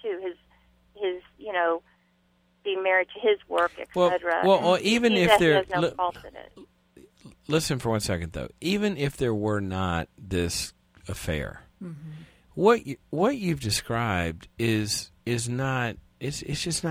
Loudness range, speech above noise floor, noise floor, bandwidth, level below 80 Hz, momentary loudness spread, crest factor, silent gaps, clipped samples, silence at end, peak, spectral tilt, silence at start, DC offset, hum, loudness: 7 LU; 41 dB; -66 dBFS; 16.5 kHz; -50 dBFS; 17 LU; 22 dB; none; under 0.1%; 0 s; -6 dBFS; -4.5 dB/octave; 0.05 s; under 0.1%; none; -26 LUFS